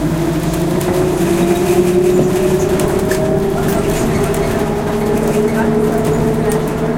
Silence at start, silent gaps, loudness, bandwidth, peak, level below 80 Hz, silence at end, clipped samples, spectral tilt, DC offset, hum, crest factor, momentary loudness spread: 0 s; none; -14 LUFS; 17 kHz; 0 dBFS; -30 dBFS; 0 s; under 0.1%; -6.5 dB/octave; under 0.1%; none; 14 dB; 4 LU